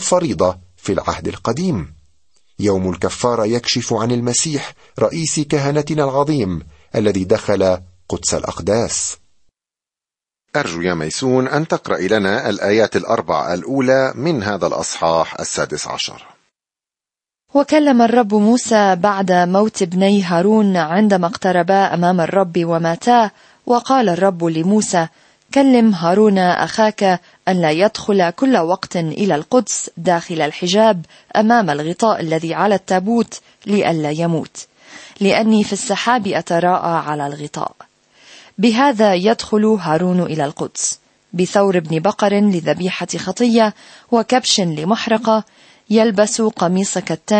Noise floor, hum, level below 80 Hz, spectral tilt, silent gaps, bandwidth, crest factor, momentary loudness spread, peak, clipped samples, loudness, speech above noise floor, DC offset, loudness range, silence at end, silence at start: -89 dBFS; none; -50 dBFS; -5 dB/octave; none; 8.8 kHz; 14 dB; 8 LU; -2 dBFS; under 0.1%; -16 LUFS; 74 dB; under 0.1%; 5 LU; 0 s; 0 s